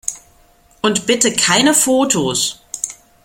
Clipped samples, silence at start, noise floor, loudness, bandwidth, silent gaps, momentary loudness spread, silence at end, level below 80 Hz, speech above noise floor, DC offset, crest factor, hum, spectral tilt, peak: under 0.1%; 0.05 s; -51 dBFS; -15 LUFS; 16.5 kHz; none; 13 LU; 0.3 s; -52 dBFS; 36 dB; under 0.1%; 18 dB; none; -2 dB/octave; 0 dBFS